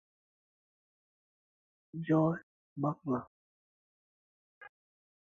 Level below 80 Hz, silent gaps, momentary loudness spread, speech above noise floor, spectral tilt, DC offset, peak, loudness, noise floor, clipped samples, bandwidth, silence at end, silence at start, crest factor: -78 dBFS; 2.43-2.76 s, 3.27-4.61 s; 16 LU; over 58 dB; -9 dB/octave; under 0.1%; -18 dBFS; -34 LUFS; under -90 dBFS; under 0.1%; 6.6 kHz; 0.7 s; 1.95 s; 22 dB